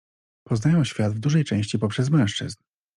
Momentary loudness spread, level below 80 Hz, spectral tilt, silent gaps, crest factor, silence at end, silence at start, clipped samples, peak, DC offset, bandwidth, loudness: 9 LU; -58 dBFS; -6.5 dB/octave; none; 14 dB; 0.4 s; 0.5 s; under 0.1%; -10 dBFS; under 0.1%; 11 kHz; -23 LUFS